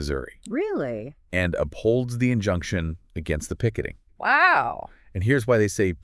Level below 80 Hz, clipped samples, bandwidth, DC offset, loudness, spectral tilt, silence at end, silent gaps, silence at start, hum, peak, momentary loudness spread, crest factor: -44 dBFS; under 0.1%; 12 kHz; under 0.1%; -24 LUFS; -6 dB/octave; 0.05 s; none; 0 s; none; -6 dBFS; 14 LU; 18 dB